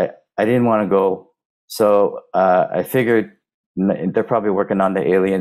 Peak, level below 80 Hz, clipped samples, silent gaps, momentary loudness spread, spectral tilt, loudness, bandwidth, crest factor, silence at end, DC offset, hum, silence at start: -4 dBFS; -58 dBFS; under 0.1%; 1.45-1.68 s, 3.54-3.75 s; 7 LU; -7 dB/octave; -17 LUFS; 15.5 kHz; 14 dB; 0 s; under 0.1%; none; 0 s